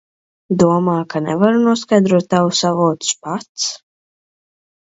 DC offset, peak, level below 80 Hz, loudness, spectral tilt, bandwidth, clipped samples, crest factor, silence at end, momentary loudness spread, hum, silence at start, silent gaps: under 0.1%; 0 dBFS; -58 dBFS; -16 LUFS; -5 dB/octave; 8 kHz; under 0.1%; 16 dB; 1.1 s; 9 LU; none; 0.5 s; 3.49-3.55 s